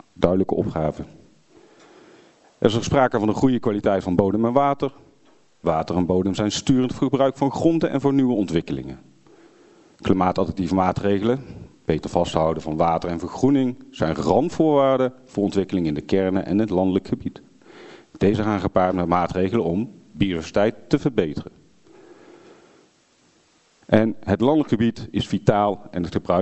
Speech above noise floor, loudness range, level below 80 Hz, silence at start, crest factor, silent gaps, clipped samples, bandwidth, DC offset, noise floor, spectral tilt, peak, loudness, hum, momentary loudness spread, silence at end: 39 dB; 4 LU; -46 dBFS; 0.2 s; 22 dB; none; under 0.1%; 8.2 kHz; under 0.1%; -59 dBFS; -7 dB/octave; 0 dBFS; -21 LUFS; none; 8 LU; 0 s